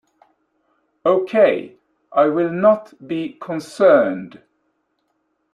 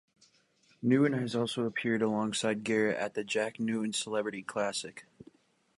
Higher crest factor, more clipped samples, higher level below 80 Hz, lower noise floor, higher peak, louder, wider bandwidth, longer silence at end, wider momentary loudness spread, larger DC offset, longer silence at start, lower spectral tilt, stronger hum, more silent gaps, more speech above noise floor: about the same, 18 dB vs 18 dB; neither; first, -68 dBFS vs -74 dBFS; about the same, -70 dBFS vs -68 dBFS; first, -2 dBFS vs -14 dBFS; first, -18 LUFS vs -31 LUFS; about the same, 10.5 kHz vs 11.5 kHz; first, 1.25 s vs 0.75 s; first, 14 LU vs 8 LU; neither; first, 1.05 s vs 0.8 s; first, -7 dB/octave vs -4.5 dB/octave; first, 50 Hz at -60 dBFS vs none; neither; first, 53 dB vs 37 dB